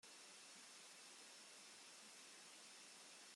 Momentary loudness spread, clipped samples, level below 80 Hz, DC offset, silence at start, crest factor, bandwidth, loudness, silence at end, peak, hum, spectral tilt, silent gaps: 0 LU; under 0.1%; under -90 dBFS; under 0.1%; 0.05 s; 14 dB; 16 kHz; -59 LUFS; 0 s; -48 dBFS; none; 0.5 dB/octave; none